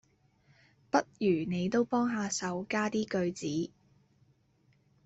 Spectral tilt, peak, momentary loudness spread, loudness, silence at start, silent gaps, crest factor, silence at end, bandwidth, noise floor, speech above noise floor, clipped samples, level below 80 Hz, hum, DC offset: -5 dB/octave; -12 dBFS; 6 LU; -32 LUFS; 0.95 s; none; 22 dB; 1.4 s; 8.2 kHz; -69 dBFS; 38 dB; under 0.1%; -70 dBFS; none; under 0.1%